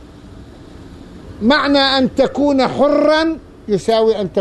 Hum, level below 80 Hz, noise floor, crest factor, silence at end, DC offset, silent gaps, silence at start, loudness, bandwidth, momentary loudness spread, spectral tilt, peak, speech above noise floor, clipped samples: none; -42 dBFS; -37 dBFS; 14 dB; 0 s; under 0.1%; none; 0 s; -14 LUFS; 11 kHz; 7 LU; -5 dB/octave; -2 dBFS; 23 dB; under 0.1%